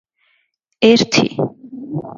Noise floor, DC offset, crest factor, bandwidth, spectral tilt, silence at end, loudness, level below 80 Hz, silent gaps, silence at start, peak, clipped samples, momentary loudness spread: -65 dBFS; under 0.1%; 18 dB; 7.4 kHz; -4.5 dB/octave; 0.05 s; -15 LUFS; -58 dBFS; none; 0.8 s; 0 dBFS; under 0.1%; 15 LU